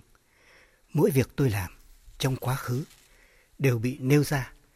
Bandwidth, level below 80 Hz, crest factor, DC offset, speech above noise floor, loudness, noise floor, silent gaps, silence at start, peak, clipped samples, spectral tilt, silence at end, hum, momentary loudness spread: 16 kHz; -52 dBFS; 18 dB; under 0.1%; 35 dB; -27 LUFS; -61 dBFS; none; 0.95 s; -10 dBFS; under 0.1%; -6.5 dB/octave; 0.25 s; none; 10 LU